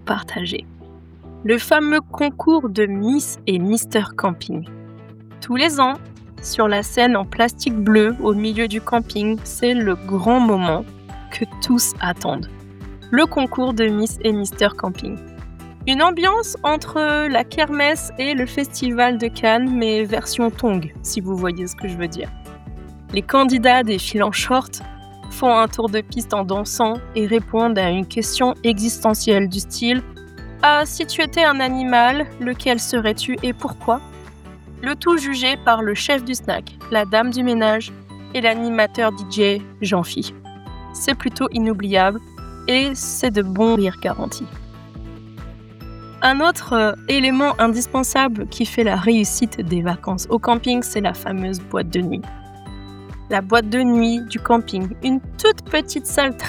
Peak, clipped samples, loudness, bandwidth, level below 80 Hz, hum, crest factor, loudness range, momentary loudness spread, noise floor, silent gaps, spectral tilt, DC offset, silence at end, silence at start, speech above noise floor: 0 dBFS; under 0.1%; -19 LUFS; 19 kHz; -40 dBFS; none; 18 dB; 3 LU; 17 LU; -41 dBFS; none; -4 dB/octave; under 0.1%; 0 s; 0 s; 23 dB